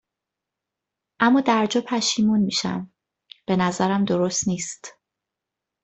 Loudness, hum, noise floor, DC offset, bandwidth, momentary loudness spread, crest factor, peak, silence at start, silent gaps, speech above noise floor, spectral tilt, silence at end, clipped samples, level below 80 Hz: -22 LUFS; none; -85 dBFS; under 0.1%; 8.4 kHz; 15 LU; 18 dB; -4 dBFS; 1.2 s; none; 64 dB; -4 dB/octave; 0.95 s; under 0.1%; -62 dBFS